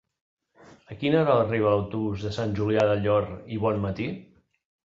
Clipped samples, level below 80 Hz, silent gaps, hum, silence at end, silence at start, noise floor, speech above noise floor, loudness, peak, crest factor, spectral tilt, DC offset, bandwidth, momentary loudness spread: under 0.1%; -52 dBFS; none; none; 0.6 s; 0.9 s; -54 dBFS; 30 dB; -25 LUFS; -8 dBFS; 18 dB; -8 dB/octave; under 0.1%; 7.6 kHz; 11 LU